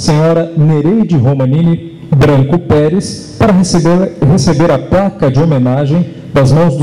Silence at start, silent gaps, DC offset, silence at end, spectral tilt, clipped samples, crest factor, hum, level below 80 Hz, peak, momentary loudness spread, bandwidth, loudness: 0 s; none; under 0.1%; 0 s; -7 dB/octave; under 0.1%; 6 dB; none; -32 dBFS; -4 dBFS; 5 LU; 11.5 kHz; -10 LUFS